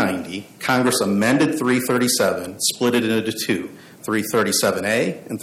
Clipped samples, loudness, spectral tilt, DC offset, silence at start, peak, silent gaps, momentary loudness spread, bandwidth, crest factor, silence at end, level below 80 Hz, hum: under 0.1%; -20 LUFS; -3.5 dB/octave; under 0.1%; 0 s; -6 dBFS; none; 8 LU; 17 kHz; 14 dB; 0 s; -62 dBFS; none